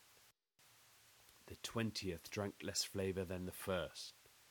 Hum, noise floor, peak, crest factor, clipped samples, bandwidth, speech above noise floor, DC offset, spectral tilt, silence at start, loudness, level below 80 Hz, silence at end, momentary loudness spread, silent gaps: none; -71 dBFS; -26 dBFS; 20 dB; under 0.1%; 19.5 kHz; 28 dB; under 0.1%; -4 dB/octave; 0 s; -44 LUFS; -70 dBFS; 0 s; 23 LU; none